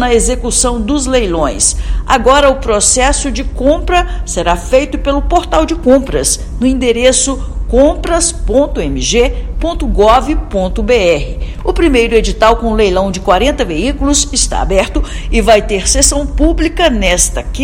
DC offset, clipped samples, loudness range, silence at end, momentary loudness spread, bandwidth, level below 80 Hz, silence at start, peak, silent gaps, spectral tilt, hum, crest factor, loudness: under 0.1%; 0.8%; 1 LU; 0 s; 7 LU; over 20 kHz; -18 dBFS; 0 s; 0 dBFS; none; -3.5 dB/octave; none; 10 dB; -11 LUFS